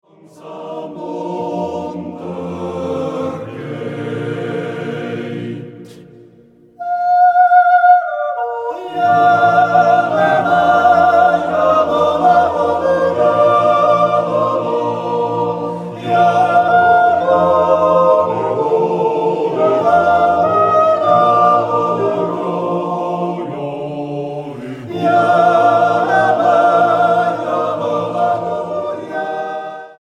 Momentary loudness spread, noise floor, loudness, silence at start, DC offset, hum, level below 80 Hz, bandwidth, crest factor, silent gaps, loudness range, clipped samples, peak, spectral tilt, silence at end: 14 LU; -46 dBFS; -14 LUFS; 0.4 s; under 0.1%; none; -54 dBFS; 9.2 kHz; 14 dB; none; 11 LU; under 0.1%; 0 dBFS; -6.5 dB/octave; 0.1 s